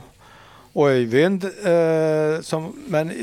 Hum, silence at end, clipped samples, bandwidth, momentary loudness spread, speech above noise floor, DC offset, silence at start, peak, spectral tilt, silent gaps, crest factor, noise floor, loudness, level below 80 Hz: none; 0 s; under 0.1%; 14 kHz; 9 LU; 28 dB; under 0.1%; 0.75 s; -4 dBFS; -6.5 dB/octave; none; 18 dB; -47 dBFS; -20 LUFS; -62 dBFS